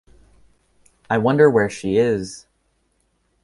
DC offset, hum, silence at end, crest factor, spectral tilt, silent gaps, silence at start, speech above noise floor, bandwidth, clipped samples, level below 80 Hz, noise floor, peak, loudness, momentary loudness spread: under 0.1%; none; 1.05 s; 20 dB; -6.5 dB/octave; none; 1.1 s; 49 dB; 11.5 kHz; under 0.1%; -54 dBFS; -66 dBFS; -2 dBFS; -18 LUFS; 15 LU